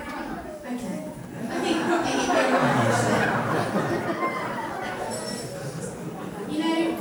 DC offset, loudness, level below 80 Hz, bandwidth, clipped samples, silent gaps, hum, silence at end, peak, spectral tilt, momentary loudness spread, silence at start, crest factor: under 0.1%; -26 LUFS; -54 dBFS; over 20 kHz; under 0.1%; none; none; 0 s; -8 dBFS; -5 dB/octave; 13 LU; 0 s; 18 dB